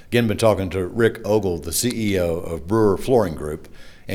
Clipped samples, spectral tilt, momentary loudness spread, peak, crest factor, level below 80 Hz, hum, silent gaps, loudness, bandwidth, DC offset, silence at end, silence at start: under 0.1%; -5.5 dB/octave; 10 LU; -2 dBFS; 18 dB; -40 dBFS; none; none; -21 LUFS; over 20 kHz; under 0.1%; 0 s; 0 s